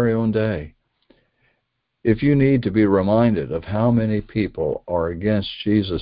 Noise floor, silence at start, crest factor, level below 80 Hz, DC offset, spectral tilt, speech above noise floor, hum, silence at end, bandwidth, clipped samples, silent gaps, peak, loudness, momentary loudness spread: -74 dBFS; 0 s; 16 dB; -42 dBFS; under 0.1%; -12.5 dB/octave; 55 dB; none; 0 s; 5.2 kHz; under 0.1%; none; -4 dBFS; -20 LUFS; 8 LU